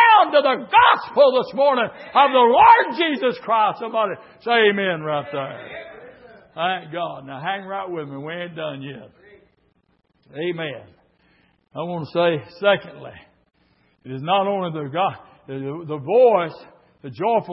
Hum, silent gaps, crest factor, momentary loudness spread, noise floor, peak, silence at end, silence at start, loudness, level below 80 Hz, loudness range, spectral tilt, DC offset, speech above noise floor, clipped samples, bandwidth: none; none; 20 dB; 22 LU; -63 dBFS; 0 dBFS; 0 s; 0 s; -19 LUFS; -62 dBFS; 16 LU; -9.5 dB/octave; under 0.1%; 44 dB; under 0.1%; 5.8 kHz